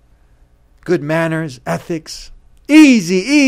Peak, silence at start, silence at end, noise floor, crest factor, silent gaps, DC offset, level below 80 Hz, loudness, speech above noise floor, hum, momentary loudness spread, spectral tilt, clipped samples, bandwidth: 0 dBFS; 0.85 s; 0 s; -49 dBFS; 14 dB; none; under 0.1%; -46 dBFS; -13 LUFS; 37 dB; none; 21 LU; -5 dB/octave; 0.4%; 14 kHz